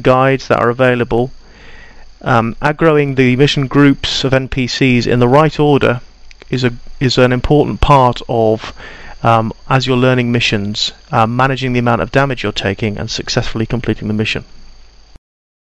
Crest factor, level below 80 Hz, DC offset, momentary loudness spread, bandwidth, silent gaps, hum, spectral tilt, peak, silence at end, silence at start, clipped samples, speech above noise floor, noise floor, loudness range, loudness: 14 dB; -30 dBFS; under 0.1%; 8 LU; 11 kHz; none; none; -6 dB/octave; 0 dBFS; 0.95 s; 0 s; under 0.1%; 25 dB; -38 dBFS; 4 LU; -13 LUFS